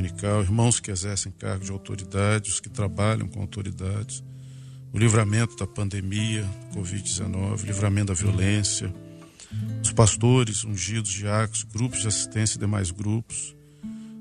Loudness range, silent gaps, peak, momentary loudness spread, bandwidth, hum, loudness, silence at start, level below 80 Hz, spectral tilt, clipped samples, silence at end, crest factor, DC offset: 4 LU; none; -4 dBFS; 15 LU; 11.5 kHz; none; -25 LUFS; 0 s; -48 dBFS; -4.5 dB/octave; under 0.1%; 0 s; 22 dB; under 0.1%